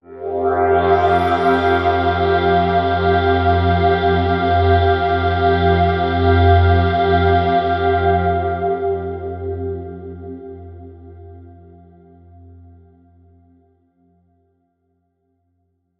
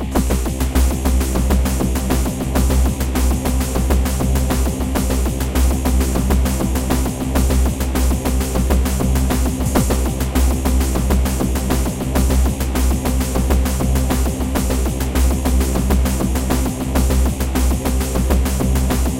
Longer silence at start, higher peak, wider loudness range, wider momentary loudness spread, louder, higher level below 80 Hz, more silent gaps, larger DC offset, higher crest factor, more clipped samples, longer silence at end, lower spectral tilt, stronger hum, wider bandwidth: about the same, 0.1 s vs 0 s; about the same, -2 dBFS vs 0 dBFS; first, 15 LU vs 0 LU; first, 12 LU vs 2 LU; about the same, -16 LUFS vs -18 LUFS; second, -38 dBFS vs -18 dBFS; neither; neither; about the same, 16 dB vs 16 dB; neither; first, 4.5 s vs 0 s; first, -9 dB/octave vs -5.5 dB/octave; neither; second, 5.8 kHz vs 17 kHz